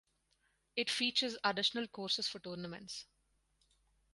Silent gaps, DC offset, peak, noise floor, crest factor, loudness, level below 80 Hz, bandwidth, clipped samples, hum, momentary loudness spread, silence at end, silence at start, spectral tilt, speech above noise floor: none; under 0.1%; -18 dBFS; -78 dBFS; 24 dB; -36 LUFS; -78 dBFS; 11.5 kHz; under 0.1%; none; 13 LU; 1.1 s; 0.75 s; -2.5 dB/octave; 40 dB